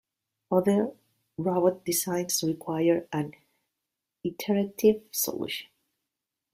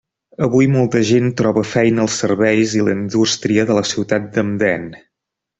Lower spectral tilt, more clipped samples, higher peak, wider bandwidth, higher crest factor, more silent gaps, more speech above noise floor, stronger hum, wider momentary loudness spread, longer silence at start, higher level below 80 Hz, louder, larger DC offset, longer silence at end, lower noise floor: about the same, -4.5 dB/octave vs -5.5 dB/octave; neither; second, -10 dBFS vs 0 dBFS; first, 16 kHz vs 8.4 kHz; about the same, 20 dB vs 16 dB; neither; second, 60 dB vs 66 dB; neither; first, 11 LU vs 5 LU; about the same, 0.5 s vs 0.4 s; second, -68 dBFS vs -52 dBFS; second, -28 LUFS vs -16 LUFS; neither; first, 0.9 s vs 0.6 s; first, -86 dBFS vs -81 dBFS